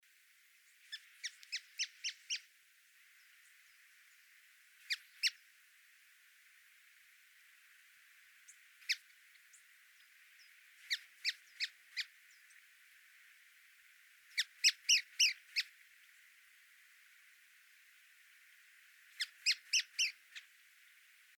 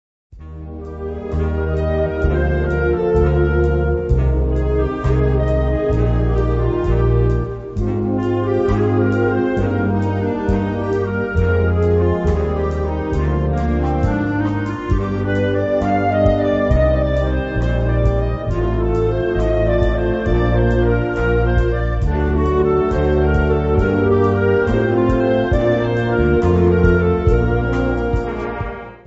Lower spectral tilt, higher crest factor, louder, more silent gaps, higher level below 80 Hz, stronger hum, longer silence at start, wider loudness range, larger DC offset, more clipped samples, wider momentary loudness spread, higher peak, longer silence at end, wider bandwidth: second, 9.5 dB/octave vs -9 dB/octave; first, 26 dB vs 16 dB; second, -37 LUFS vs -17 LUFS; neither; second, under -90 dBFS vs -22 dBFS; neither; first, 0.9 s vs 0.3 s; first, 13 LU vs 2 LU; neither; neither; first, 29 LU vs 5 LU; second, -18 dBFS vs 0 dBFS; first, 1 s vs 0.1 s; first, over 20 kHz vs 7.6 kHz